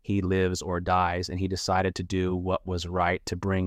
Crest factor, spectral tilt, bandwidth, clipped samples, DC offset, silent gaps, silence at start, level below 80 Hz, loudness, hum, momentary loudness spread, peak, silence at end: 16 dB; -5.5 dB/octave; 13.5 kHz; under 0.1%; under 0.1%; none; 0.05 s; -48 dBFS; -27 LUFS; none; 5 LU; -12 dBFS; 0 s